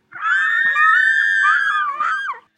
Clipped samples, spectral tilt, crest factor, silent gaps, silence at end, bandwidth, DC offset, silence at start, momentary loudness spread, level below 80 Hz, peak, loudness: under 0.1%; 1.5 dB/octave; 14 dB; none; 0.2 s; 10 kHz; under 0.1%; 0.15 s; 8 LU; -80 dBFS; -4 dBFS; -15 LUFS